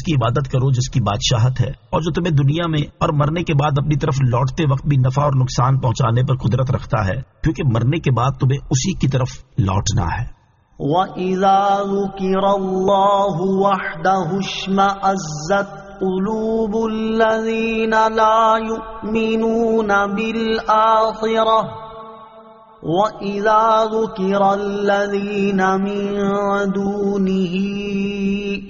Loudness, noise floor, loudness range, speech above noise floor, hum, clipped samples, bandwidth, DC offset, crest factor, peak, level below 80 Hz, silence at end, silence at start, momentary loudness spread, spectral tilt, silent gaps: -18 LUFS; -43 dBFS; 2 LU; 26 dB; none; under 0.1%; 7.2 kHz; under 0.1%; 14 dB; -2 dBFS; -38 dBFS; 0 s; 0 s; 7 LU; -6 dB/octave; none